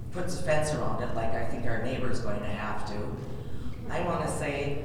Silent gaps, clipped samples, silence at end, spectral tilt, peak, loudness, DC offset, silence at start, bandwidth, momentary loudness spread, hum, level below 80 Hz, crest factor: none; under 0.1%; 0 s; -5.5 dB/octave; -14 dBFS; -32 LUFS; under 0.1%; 0 s; 16 kHz; 9 LU; none; -44 dBFS; 14 dB